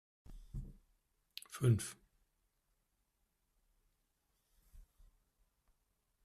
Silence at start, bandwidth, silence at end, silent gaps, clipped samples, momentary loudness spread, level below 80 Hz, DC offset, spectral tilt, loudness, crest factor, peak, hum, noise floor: 0.3 s; 14 kHz; 1.4 s; none; under 0.1%; 22 LU; -60 dBFS; under 0.1%; -6 dB/octave; -37 LUFS; 24 dB; -20 dBFS; none; -82 dBFS